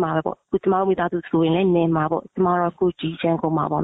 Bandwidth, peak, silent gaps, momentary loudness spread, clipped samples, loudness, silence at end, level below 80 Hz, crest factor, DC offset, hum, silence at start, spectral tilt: 4 kHz; -8 dBFS; none; 6 LU; under 0.1%; -21 LUFS; 0 s; -54 dBFS; 12 dB; under 0.1%; none; 0 s; -10.5 dB/octave